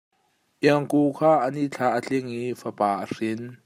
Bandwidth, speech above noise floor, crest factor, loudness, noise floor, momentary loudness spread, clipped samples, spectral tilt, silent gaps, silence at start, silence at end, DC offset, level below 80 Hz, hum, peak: 15 kHz; 45 dB; 20 dB; -24 LUFS; -69 dBFS; 10 LU; under 0.1%; -6.5 dB/octave; none; 0.6 s; 0.1 s; under 0.1%; -72 dBFS; none; -6 dBFS